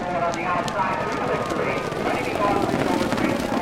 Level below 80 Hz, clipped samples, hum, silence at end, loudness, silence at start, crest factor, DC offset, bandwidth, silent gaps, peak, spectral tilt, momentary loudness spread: -46 dBFS; under 0.1%; none; 0 s; -23 LUFS; 0 s; 18 dB; under 0.1%; 17 kHz; none; -6 dBFS; -5.5 dB/octave; 3 LU